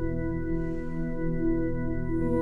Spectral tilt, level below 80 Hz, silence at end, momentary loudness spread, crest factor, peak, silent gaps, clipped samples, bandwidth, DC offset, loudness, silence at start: -11 dB/octave; -34 dBFS; 0 s; 5 LU; 12 dB; -14 dBFS; none; under 0.1%; 2.5 kHz; under 0.1%; -30 LUFS; 0 s